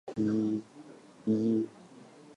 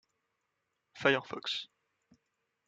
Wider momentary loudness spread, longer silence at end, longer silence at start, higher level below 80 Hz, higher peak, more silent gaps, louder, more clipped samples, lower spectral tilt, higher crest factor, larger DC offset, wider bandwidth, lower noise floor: first, 23 LU vs 10 LU; second, 0.05 s vs 1 s; second, 0.05 s vs 0.95 s; first, -74 dBFS vs -82 dBFS; second, -18 dBFS vs -10 dBFS; neither; about the same, -32 LUFS vs -33 LUFS; neither; first, -8.5 dB/octave vs -4 dB/octave; second, 14 dB vs 28 dB; neither; about the same, 9 kHz vs 9 kHz; second, -53 dBFS vs -83 dBFS